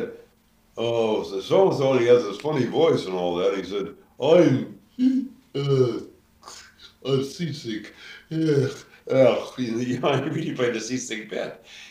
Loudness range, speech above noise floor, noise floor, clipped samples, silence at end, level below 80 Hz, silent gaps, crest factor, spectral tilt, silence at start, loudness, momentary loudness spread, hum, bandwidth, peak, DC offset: 6 LU; 37 dB; -60 dBFS; under 0.1%; 0 s; -64 dBFS; none; 18 dB; -6 dB/octave; 0 s; -23 LUFS; 16 LU; none; 15 kHz; -4 dBFS; under 0.1%